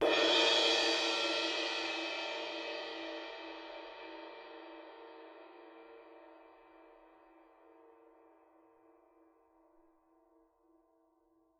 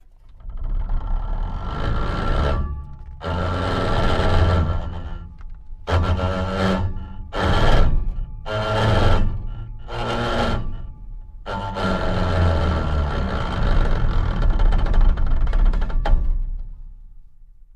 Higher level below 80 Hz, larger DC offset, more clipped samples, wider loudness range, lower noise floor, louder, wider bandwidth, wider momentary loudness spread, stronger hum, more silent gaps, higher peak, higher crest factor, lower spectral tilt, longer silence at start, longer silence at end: second, -80 dBFS vs -22 dBFS; neither; neither; first, 26 LU vs 3 LU; first, -73 dBFS vs -43 dBFS; second, -32 LUFS vs -23 LUFS; first, 14 kHz vs 8.4 kHz; first, 28 LU vs 16 LU; neither; neither; second, -16 dBFS vs -2 dBFS; first, 22 dB vs 16 dB; second, -0.5 dB/octave vs -7 dB/octave; second, 0 s vs 0.25 s; first, 4.8 s vs 0.25 s